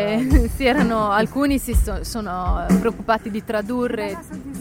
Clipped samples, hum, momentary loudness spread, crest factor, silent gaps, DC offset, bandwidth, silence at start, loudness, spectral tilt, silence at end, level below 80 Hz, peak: under 0.1%; none; 9 LU; 18 dB; none; under 0.1%; 17 kHz; 0 s; -21 LUFS; -6 dB/octave; 0 s; -26 dBFS; -2 dBFS